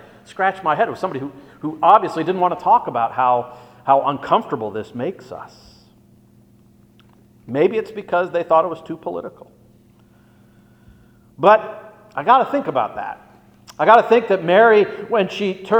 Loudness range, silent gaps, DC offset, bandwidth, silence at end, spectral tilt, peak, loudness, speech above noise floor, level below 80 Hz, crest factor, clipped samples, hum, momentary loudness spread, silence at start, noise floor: 9 LU; none; under 0.1%; 9 kHz; 0 s; -6.5 dB/octave; 0 dBFS; -18 LUFS; 34 dB; -62 dBFS; 20 dB; under 0.1%; none; 18 LU; 0.35 s; -51 dBFS